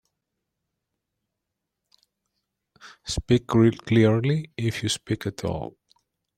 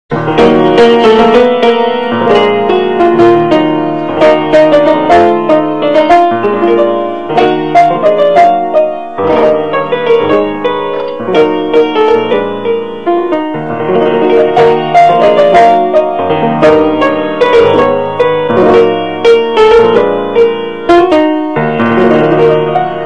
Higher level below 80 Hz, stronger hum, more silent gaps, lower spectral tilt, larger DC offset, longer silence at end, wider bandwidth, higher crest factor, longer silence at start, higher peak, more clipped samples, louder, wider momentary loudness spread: second, -48 dBFS vs -40 dBFS; neither; neither; about the same, -6 dB/octave vs -6.5 dB/octave; second, under 0.1% vs 3%; first, 0.65 s vs 0 s; first, 14 kHz vs 9.2 kHz; first, 20 dB vs 8 dB; first, 2.85 s vs 0.1 s; second, -6 dBFS vs 0 dBFS; second, under 0.1% vs 2%; second, -24 LUFS vs -8 LUFS; first, 12 LU vs 7 LU